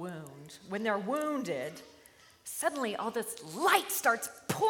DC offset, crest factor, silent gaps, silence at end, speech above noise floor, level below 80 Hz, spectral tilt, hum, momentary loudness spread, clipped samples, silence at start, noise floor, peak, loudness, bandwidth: under 0.1%; 24 dB; none; 0 s; 27 dB; -78 dBFS; -3 dB/octave; none; 19 LU; under 0.1%; 0 s; -59 dBFS; -10 dBFS; -32 LUFS; 17.5 kHz